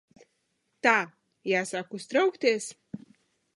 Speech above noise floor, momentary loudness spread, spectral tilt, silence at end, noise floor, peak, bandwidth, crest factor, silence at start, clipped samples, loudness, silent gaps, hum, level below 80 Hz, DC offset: 49 dB; 19 LU; -3.5 dB/octave; 0.6 s; -76 dBFS; -6 dBFS; 11.5 kHz; 24 dB; 0.85 s; under 0.1%; -27 LUFS; none; none; -78 dBFS; under 0.1%